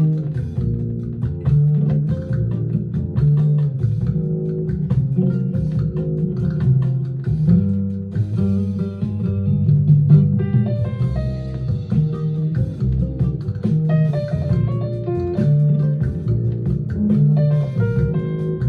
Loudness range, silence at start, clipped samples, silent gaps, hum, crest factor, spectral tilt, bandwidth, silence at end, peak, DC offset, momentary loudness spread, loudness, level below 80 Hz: 3 LU; 0 s; under 0.1%; none; none; 16 dB; -11.5 dB/octave; 4.6 kHz; 0 s; -2 dBFS; under 0.1%; 7 LU; -19 LUFS; -36 dBFS